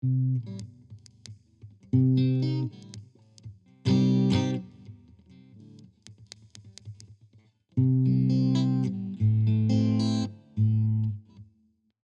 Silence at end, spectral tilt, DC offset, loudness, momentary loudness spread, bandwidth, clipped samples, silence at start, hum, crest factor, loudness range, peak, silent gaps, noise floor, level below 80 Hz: 0.6 s; -8 dB/octave; under 0.1%; -26 LUFS; 23 LU; 8.4 kHz; under 0.1%; 0.05 s; none; 16 dB; 6 LU; -12 dBFS; none; -68 dBFS; -62 dBFS